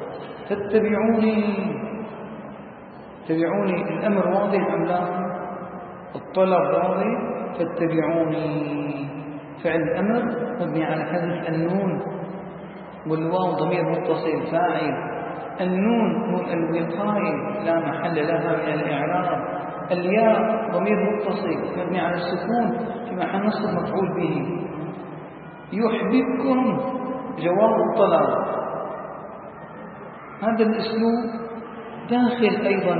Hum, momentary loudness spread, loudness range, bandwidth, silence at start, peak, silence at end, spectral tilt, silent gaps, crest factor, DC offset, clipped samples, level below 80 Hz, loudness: none; 16 LU; 3 LU; 4.8 kHz; 0 s; -4 dBFS; 0 s; -11.5 dB/octave; none; 20 dB; under 0.1%; under 0.1%; -60 dBFS; -23 LUFS